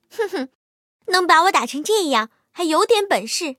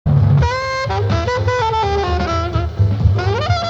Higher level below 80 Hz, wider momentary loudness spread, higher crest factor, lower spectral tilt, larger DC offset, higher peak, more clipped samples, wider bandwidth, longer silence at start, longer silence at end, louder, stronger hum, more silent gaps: second, -76 dBFS vs -26 dBFS; first, 15 LU vs 5 LU; about the same, 18 dB vs 14 dB; second, -1.5 dB/octave vs -6.5 dB/octave; neither; about the same, 0 dBFS vs -2 dBFS; neither; first, 16.5 kHz vs 7.8 kHz; about the same, 0.15 s vs 0.05 s; about the same, 0.05 s vs 0 s; about the same, -18 LUFS vs -17 LUFS; neither; first, 0.55-1.00 s vs none